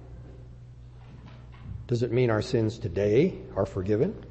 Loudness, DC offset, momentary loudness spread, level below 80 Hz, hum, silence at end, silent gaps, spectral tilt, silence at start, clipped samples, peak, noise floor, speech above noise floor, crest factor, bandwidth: -27 LUFS; under 0.1%; 23 LU; -48 dBFS; none; 0 s; none; -8 dB/octave; 0 s; under 0.1%; -10 dBFS; -46 dBFS; 20 dB; 18 dB; 8.6 kHz